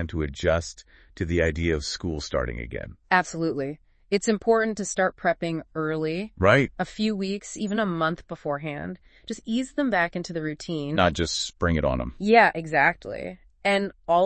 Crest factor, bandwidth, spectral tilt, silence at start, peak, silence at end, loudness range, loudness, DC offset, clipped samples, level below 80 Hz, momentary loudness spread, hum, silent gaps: 22 dB; 8.8 kHz; -5 dB/octave; 0 s; -4 dBFS; 0 s; 5 LU; -25 LUFS; under 0.1%; under 0.1%; -44 dBFS; 13 LU; none; none